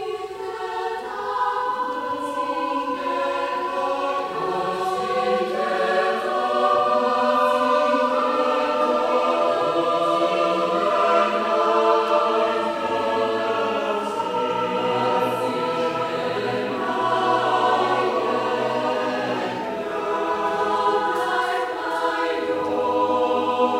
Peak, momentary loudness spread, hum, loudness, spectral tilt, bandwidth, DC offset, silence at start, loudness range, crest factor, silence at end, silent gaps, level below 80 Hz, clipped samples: -6 dBFS; 6 LU; none; -22 LUFS; -4.5 dB/octave; 16 kHz; under 0.1%; 0 s; 5 LU; 16 dB; 0 s; none; -62 dBFS; under 0.1%